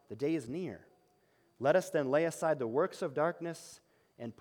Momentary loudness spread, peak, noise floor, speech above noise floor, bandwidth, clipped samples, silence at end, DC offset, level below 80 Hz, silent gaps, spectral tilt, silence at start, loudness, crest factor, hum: 17 LU; -16 dBFS; -71 dBFS; 38 dB; 17.5 kHz; under 0.1%; 0.1 s; under 0.1%; -80 dBFS; none; -6 dB/octave; 0.1 s; -34 LUFS; 18 dB; none